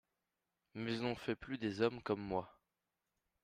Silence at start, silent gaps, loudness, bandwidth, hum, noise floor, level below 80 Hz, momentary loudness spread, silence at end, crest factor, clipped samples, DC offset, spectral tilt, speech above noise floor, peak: 0.75 s; none; -40 LUFS; 13 kHz; none; -89 dBFS; -70 dBFS; 9 LU; 0.9 s; 22 dB; under 0.1%; under 0.1%; -6.5 dB/octave; 50 dB; -20 dBFS